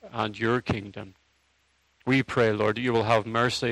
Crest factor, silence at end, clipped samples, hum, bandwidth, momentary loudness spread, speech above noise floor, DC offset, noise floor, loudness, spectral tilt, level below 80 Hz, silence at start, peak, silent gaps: 20 dB; 0 s; under 0.1%; none; 13 kHz; 15 LU; 43 dB; under 0.1%; -68 dBFS; -26 LUFS; -5.5 dB/octave; -58 dBFS; 0.05 s; -6 dBFS; none